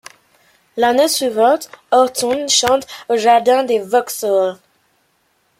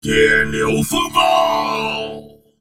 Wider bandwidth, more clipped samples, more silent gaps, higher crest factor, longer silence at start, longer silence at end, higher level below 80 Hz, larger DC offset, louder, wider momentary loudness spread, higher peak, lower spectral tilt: about the same, 16.5 kHz vs 17.5 kHz; neither; neither; about the same, 14 dB vs 18 dB; first, 0.75 s vs 0.05 s; first, 1.05 s vs 0.25 s; second, -60 dBFS vs -40 dBFS; neither; about the same, -15 LUFS vs -16 LUFS; second, 6 LU vs 12 LU; about the same, -2 dBFS vs 0 dBFS; second, -1.5 dB/octave vs -3.5 dB/octave